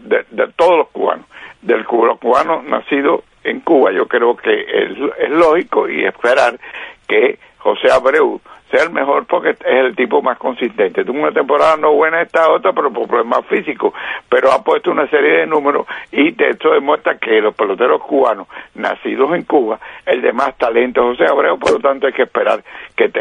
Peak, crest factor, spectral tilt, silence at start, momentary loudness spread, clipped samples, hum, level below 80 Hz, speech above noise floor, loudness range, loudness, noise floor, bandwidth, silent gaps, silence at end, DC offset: 0 dBFS; 14 dB; -5 dB/octave; 0.05 s; 7 LU; under 0.1%; none; -56 dBFS; 23 dB; 2 LU; -14 LUFS; -36 dBFS; 10 kHz; none; 0 s; under 0.1%